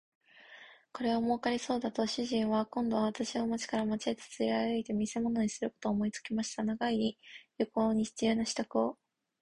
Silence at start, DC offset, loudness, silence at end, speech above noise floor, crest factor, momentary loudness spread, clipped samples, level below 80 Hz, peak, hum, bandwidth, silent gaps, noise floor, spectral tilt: 0.5 s; under 0.1%; -33 LUFS; 0.5 s; 23 dB; 18 dB; 6 LU; under 0.1%; -66 dBFS; -16 dBFS; none; 11 kHz; none; -56 dBFS; -4.5 dB/octave